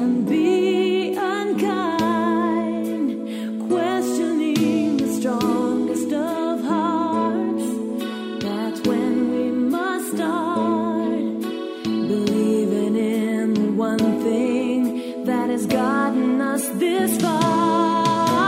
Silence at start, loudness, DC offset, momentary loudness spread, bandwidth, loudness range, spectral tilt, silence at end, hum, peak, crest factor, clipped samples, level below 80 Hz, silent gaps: 0 s; -21 LUFS; under 0.1%; 6 LU; 16 kHz; 2 LU; -5.5 dB/octave; 0 s; none; -6 dBFS; 14 dB; under 0.1%; -64 dBFS; none